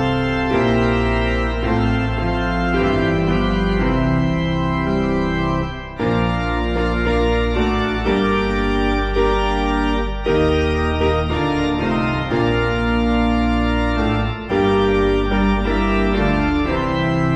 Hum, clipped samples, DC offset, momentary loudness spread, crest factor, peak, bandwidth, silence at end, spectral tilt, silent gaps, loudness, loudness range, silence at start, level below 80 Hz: none; under 0.1%; under 0.1%; 3 LU; 14 dB; -4 dBFS; 8.8 kHz; 0 s; -7.5 dB/octave; none; -18 LUFS; 2 LU; 0 s; -26 dBFS